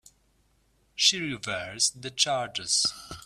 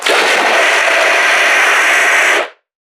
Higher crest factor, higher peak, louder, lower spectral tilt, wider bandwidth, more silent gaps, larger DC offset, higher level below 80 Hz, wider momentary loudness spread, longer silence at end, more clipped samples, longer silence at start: first, 22 dB vs 12 dB; second, -8 dBFS vs 0 dBFS; second, -25 LUFS vs -9 LUFS; first, -0.5 dB/octave vs 1 dB/octave; second, 15.5 kHz vs 19.5 kHz; neither; neither; first, -62 dBFS vs -74 dBFS; first, 10 LU vs 3 LU; second, 0.05 s vs 0.4 s; neither; first, 0.95 s vs 0 s